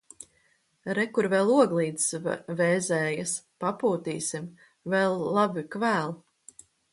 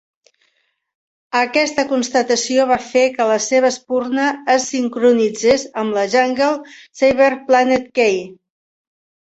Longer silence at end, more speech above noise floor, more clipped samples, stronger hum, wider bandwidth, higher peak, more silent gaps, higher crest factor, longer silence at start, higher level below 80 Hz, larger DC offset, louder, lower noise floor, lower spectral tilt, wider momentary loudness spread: second, 0.75 s vs 1.05 s; second, 41 dB vs 50 dB; neither; neither; first, 11.5 kHz vs 8.2 kHz; second, -8 dBFS vs -2 dBFS; neither; about the same, 20 dB vs 16 dB; second, 0.2 s vs 1.35 s; second, -72 dBFS vs -56 dBFS; neither; second, -27 LUFS vs -16 LUFS; about the same, -68 dBFS vs -66 dBFS; first, -4.5 dB/octave vs -3 dB/octave; first, 16 LU vs 6 LU